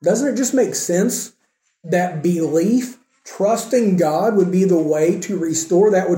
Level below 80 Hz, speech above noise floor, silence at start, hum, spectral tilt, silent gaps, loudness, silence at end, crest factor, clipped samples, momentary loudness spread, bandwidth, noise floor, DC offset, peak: -68 dBFS; 39 dB; 0 s; none; -5.5 dB/octave; none; -18 LUFS; 0 s; 12 dB; under 0.1%; 6 LU; 17 kHz; -56 dBFS; under 0.1%; -4 dBFS